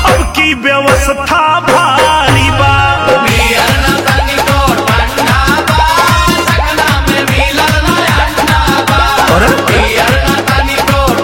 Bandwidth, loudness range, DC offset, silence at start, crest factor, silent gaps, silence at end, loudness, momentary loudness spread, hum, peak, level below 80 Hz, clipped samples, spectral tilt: 17 kHz; 1 LU; 0.1%; 0 s; 8 dB; none; 0 s; -8 LUFS; 3 LU; none; 0 dBFS; -18 dBFS; 0.6%; -4 dB/octave